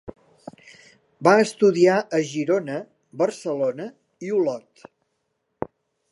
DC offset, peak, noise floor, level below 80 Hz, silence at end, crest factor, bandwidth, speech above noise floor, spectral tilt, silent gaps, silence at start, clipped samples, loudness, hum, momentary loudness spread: under 0.1%; -2 dBFS; -75 dBFS; -64 dBFS; 0.45 s; 22 dB; 11.5 kHz; 54 dB; -5.5 dB/octave; none; 0.05 s; under 0.1%; -21 LUFS; none; 20 LU